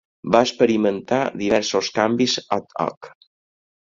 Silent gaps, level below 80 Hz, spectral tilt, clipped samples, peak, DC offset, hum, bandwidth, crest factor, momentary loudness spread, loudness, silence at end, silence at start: 2.97-3.01 s; -58 dBFS; -4 dB/octave; under 0.1%; -2 dBFS; under 0.1%; none; 7.8 kHz; 20 dB; 8 LU; -20 LUFS; 0.7 s; 0.25 s